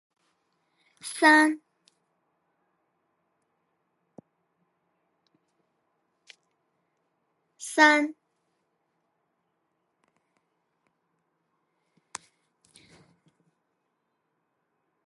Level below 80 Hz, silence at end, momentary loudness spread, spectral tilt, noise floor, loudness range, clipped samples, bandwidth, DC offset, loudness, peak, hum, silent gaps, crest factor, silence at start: -88 dBFS; 6.95 s; 25 LU; -1.5 dB/octave; -78 dBFS; 7 LU; under 0.1%; 11.5 kHz; under 0.1%; -21 LUFS; -6 dBFS; none; none; 28 dB; 1.05 s